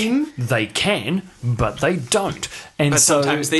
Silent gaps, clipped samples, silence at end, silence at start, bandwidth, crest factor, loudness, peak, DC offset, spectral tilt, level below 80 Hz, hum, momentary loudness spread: none; under 0.1%; 0 s; 0 s; 13 kHz; 16 dB; -19 LUFS; -2 dBFS; under 0.1%; -3.5 dB/octave; -44 dBFS; none; 11 LU